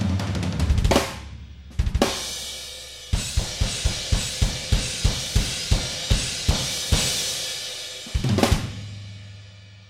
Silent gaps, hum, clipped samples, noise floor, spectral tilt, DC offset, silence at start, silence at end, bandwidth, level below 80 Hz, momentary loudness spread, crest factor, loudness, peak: none; none; under 0.1%; -44 dBFS; -3.5 dB/octave; under 0.1%; 0 s; 0.05 s; 16.5 kHz; -28 dBFS; 15 LU; 22 dB; -24 LUFS; -2 dBFS